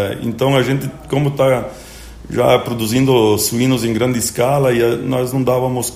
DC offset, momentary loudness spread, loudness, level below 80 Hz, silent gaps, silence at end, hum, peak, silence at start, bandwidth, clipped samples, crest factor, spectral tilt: under 0.1%; 8 LU; -16 LUFS; -42 dBFS; none; 0 s; none; 0 dBFS; 0 s; 16 kHz; under 0.1%; 16 dB; -5.5 dB/octave